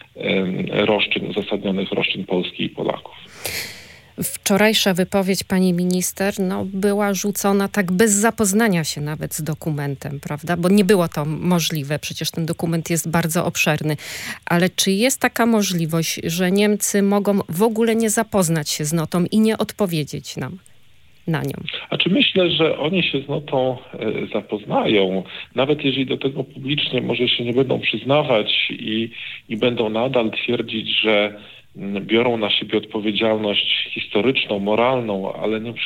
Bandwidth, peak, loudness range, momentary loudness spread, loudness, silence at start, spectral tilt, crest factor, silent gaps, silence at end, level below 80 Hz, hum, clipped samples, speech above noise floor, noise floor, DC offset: 17 kHz; 0 dBFS; 3 LU; 10 LU; -20 LUFS; 0.15 s; -4 dB/octave; 20 dB; none; 0 s; -56 dBFS; none; under 0.1%; 35 dB; -55 dBFS; under 0.1%